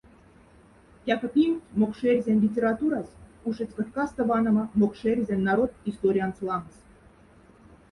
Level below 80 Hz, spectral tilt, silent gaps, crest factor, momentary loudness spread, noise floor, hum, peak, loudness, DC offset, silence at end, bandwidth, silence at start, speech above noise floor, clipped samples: -56 dBFS; -8 dB/octave; none; 18 dB; 9 LU; -55 dBFS; none; -10 dBFS; -26 LUFS; under 0.1%; 1.25 s; 10.5 kHz; 1.05 s; 30 dB; under 0.1%